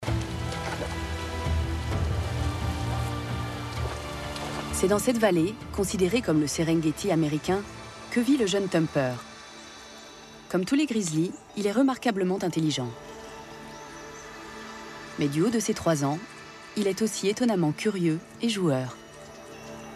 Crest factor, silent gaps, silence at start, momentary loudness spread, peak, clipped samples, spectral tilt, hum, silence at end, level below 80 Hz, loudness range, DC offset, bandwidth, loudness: 18 dB; none; 0 s; 18 LU; -10 dBFS; under 0.1%; -5.5 dB/octave; none; 0 s; -44 dBFS; 5 LU; under 0.1%; 14.5 kHz; -27 LUFS